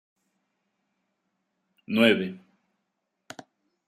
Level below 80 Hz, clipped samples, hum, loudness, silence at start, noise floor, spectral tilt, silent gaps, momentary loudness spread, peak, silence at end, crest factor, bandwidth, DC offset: -76 dBFS; under 0.1%; none; -24 LUFS; 1.9 s; -80 dBFS; -5.5 dB/octave; none; 25 LU; -6 dBFS; 1.5 s; 26 dB; 14 kHz; under 0.1%